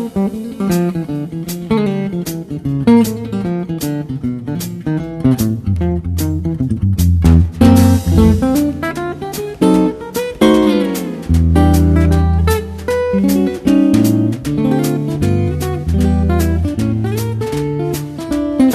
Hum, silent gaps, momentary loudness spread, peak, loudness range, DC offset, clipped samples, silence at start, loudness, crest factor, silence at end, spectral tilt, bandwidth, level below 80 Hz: none; none; 11 LU; 0 dBFS; 5 LU; under 0.1%; under 0.1%; 0 s; -15 LUFS; 14 dB; 0 s; -7 dB/octave; 14 kHz; -24 dBFS